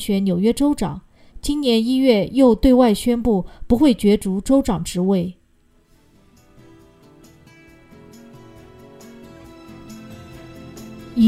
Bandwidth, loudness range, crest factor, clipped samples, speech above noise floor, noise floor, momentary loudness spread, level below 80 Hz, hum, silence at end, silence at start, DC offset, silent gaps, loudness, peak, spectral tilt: 15 kHz; 13 LU; 18 dB; under 0.1%; 40 dB; -57 dBFS; 24 LU; -38 dBFS; none; 0 s; 0 s; under 0.1%; none; -18 LUFS; -2 dBFS; -6.5 dB/octave